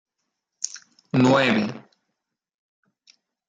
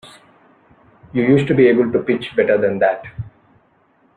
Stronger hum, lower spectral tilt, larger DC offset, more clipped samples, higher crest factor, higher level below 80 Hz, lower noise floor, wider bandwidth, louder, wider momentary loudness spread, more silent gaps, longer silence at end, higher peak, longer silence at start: neither; second, -5 dB/octave vs -8 dB/octave; neither; neither; about the same, 20 dB vs 16 dB; second, -68 dBFS vs -52 dBFS; first, -81 dBFS vs -57 dBFS; about the same, 9.4 kHz vs 9.2 kHz; second, -22 LUFS vs -16 LUFS; first, 21 LU vs 18 LU; neither; first, 1.7 s vs 0.9 s; second, -6 dBFS vs -2 dBFS; first, 0.6 s vs 0.05 s